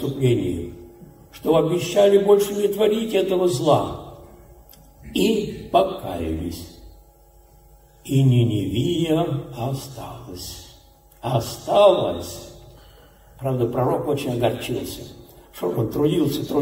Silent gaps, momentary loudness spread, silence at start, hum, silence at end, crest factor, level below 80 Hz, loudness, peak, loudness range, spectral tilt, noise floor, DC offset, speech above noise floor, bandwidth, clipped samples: none; 20 LU; 0 s; none; 0 s; 18 dB; -46 dBFS; -21 LUFS; -4 dBFS; 6 LU; -6.5 dB/octave; -51 dBFS; under 0.1%; 31 dB; 16 kHz; under 0.1%